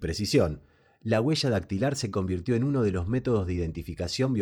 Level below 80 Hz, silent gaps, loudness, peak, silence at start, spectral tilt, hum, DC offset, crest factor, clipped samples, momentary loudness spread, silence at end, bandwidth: -46 dBFS; none; -27 LUFS; -10 dBFS; 0 s; -6 dB/octave; none; under 0.1%; 18 dB; under 0.1%; 8 LU; 0 s; 18 kHz